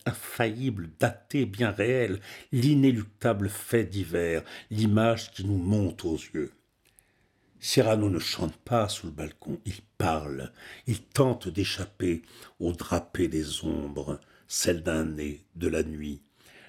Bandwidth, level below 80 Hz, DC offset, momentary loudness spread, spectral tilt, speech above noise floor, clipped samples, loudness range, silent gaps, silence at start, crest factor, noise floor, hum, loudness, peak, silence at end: 17 kHz; -52 dBFS; under 0.1%; 13 LU; -5.5 dB/octave; 39 dB; under 0.1%; 4 LU; none; 0.05 s; 20 dB; -67 dBFS; none; -29 LUFS; -8 dBFS; 0.1 s